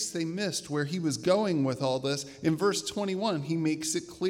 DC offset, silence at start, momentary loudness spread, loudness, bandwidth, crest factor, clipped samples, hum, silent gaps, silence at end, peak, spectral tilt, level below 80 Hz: under 0.1%; 0 s; 5 LU; -29 LUFS; 17 kHz; 16 dB; under 0.1%; none; none; 0 s; -12 dBFS; -4.5 dB/octave; -68 dBFS